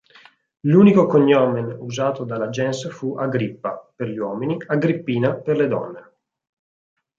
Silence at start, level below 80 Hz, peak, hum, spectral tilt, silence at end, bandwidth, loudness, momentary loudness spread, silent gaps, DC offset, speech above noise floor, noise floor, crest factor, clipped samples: 0.65 s; -64 dBFS; -2 dBFS; none; -7.5 dB/octave; 1.2 s; 7.4 kHz; -20 LUFS; 14 LU; none; under 0.1%; 32 dB; -51 dBFS; 18 dB; under 0.1%